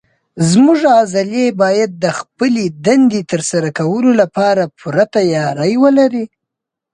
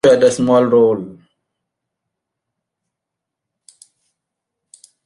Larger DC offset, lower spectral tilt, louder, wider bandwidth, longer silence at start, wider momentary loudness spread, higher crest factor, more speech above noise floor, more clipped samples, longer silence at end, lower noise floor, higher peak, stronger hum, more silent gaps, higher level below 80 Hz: neither; about the same, -5.5 dB/octave vs -5.5 dB/octave; about the same, -13 LUFS vs -13 LUFS; about the same, 11 kHz vs 11.5 kHz; first, 0.35 s vs 0.05 s; second, 7 LU vs 13 LU; second, 12 dB vs 18 dB; about the same, 67 dB vs 69 dB; neither; second, 0.7 s vs 3.95 s; about the same, -80 dBFS vs -82 dBFS; about the same, 0 dBFS vs -2 dBFS; neither; neither; about the same, -56 dBFS vs -60 dBFS